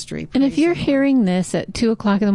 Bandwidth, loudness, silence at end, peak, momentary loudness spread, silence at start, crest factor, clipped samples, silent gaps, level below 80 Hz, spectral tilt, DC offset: 11.5 kHz; -18 LUFS; 0 s; -8 dBFS; 5 LU; 0 s; 10 dB; under 0.1%; none; -46 dBFS; -6 dB/octave; 0.3%